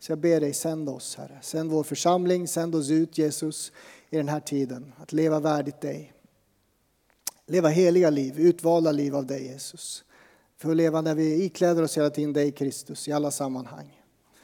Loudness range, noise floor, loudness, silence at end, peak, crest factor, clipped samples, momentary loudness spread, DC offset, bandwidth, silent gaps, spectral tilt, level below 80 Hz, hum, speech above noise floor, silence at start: 5 LU; -69 dBFS; -25 LUFS; 0.55 s; -8 dBFS; 18 dB; under 0.1%; 15 LU; under 0.1%; 18.5 kHz; none; -5.5 dB/octave; -76 dBFS; none; 44 dB; 0 s